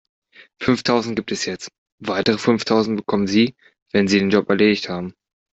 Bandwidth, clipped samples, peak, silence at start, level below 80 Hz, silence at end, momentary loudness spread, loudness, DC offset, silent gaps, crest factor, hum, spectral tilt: 8 kHz; under 0.1%; -2 dBFS; 0.6 s; -56 dBFS; 0.4 s; 11 LU; -19 LUFS; under 0.1%; 1.78-1.86 s, 1.92-1.98 s, 3.82-3.86 s; 18 dB; none; -5 dB/octave